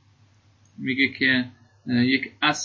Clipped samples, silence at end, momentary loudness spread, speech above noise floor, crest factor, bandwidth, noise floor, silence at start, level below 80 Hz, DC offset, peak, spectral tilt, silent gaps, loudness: under 0.1%; 0 s; 14 LU; 35 dB; 18 dB; 7.8 kHz; -58 dBFS; 0.8 s; -62 dBFS; under 0.1%; -6 dBFS; -4 dB/octave; none; -22 LUFS